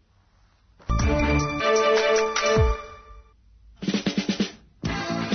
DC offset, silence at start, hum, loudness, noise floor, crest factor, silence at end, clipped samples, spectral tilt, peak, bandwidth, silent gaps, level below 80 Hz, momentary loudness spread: under 0.1%; 0.9 s; none; -24 LUFS; -60 dBFS; 14 dB; 0 s; under 0.1%; -5 dB/octave; -10 dBFS; 6.6 kHz; none; -34 dBFS; 13 LU